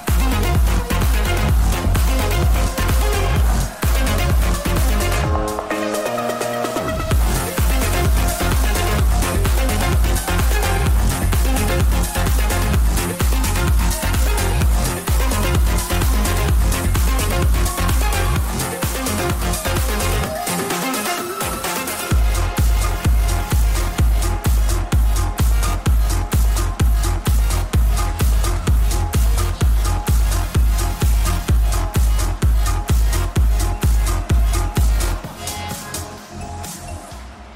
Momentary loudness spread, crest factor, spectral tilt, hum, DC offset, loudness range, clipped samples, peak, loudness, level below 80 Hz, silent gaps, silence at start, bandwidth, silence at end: 4 LU; 10 dB; -4.5 dB/octave; none; under 0.1%; 2 LU; under 0.1%; -6 dBFS; -19 LUFS; -18 dBFS; none; 0 s; 16.5 kHz; 0 s